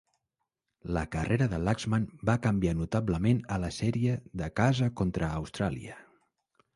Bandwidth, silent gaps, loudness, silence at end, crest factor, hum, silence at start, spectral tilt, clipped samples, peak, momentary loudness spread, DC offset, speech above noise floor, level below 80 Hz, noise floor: 11.5 kHz; none; -30 LUFS; 0.75 s; 20 dB; none; 0.85 s; -7 dB/octave; under 0.1%; -10 dBFS; 7 LU; under 0.1%; 56 dB; -46 dBFS; -85 dBFS